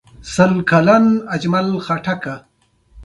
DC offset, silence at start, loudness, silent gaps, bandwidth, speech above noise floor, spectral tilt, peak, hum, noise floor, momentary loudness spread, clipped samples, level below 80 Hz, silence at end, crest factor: under 0.1%; 0.2 s; -16 LUFS; none; 11.5 kHz; 38 dB; -6.5 dB/octave; 0 dBFS; none; -53 dBFS; 13 LU; under 0.1%; -46 dBFS; 0 s; 16 dB